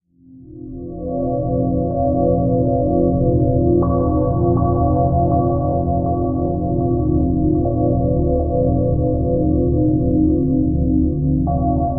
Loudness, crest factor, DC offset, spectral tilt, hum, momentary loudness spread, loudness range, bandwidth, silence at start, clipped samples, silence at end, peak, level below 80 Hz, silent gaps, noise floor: -17 LUFS; 14 dB; 1%; -13.5 dB/octave; none; 4 LU; 2 LU; 1.6 kHz; 0 s; under 0.1%; 0 s; -4 dBFS; -26 dBFS; none; -43 dBFS